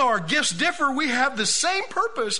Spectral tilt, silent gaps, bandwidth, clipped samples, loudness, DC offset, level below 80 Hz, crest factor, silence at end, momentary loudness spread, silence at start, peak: -1.5 dB/octave; none; 11 kHz; under 0.1%; -22 LUFS; 1%; -60 dBFS; 16 dB; 0 s; 4 LU; 0 s; -8 dBFS